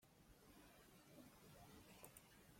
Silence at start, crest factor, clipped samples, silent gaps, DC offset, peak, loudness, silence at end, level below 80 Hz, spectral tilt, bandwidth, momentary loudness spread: 0 s; 26 dB; under 0.1%; none; under 0.1%; -42 dBFS; -65 LUFS; 0 s; -78 dBFS; -4 dB/octave; 16.5 kHz; 5 LU